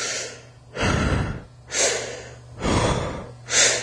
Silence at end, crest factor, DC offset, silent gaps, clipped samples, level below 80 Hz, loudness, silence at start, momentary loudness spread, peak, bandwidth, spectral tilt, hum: 0 s; 20 dB; under 0.1%; none; under 0.1%; -36 dBFS; -23 LUFS; 0 s; 18 LU; -4 dBFS; 11 kHz; -2.5 dB/octave; none